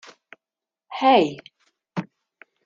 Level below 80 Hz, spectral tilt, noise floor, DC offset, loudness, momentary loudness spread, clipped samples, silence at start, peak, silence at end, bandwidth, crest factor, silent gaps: -70 dBFS; -6 dB/octave; -90 dBFS; under 0.1%; -21 LUFS; 24 LU; under 0.1%; 0.9 s; -4 dBFS; 0.65 s; 7.4 kHz; 20 dB; none